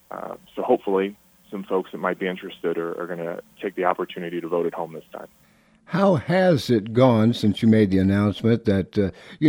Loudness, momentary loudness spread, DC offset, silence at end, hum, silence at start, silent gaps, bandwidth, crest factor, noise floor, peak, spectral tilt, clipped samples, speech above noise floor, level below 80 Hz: -22 LUFS; 15 LU; under 0.1%; 0 s; none; 0.1 s; none; over 20 kHz; 18 dB; -53 dBFS; -4 dBFS; -7.5 dB/octave; under 0.1%; 31 dB; -58 dBFS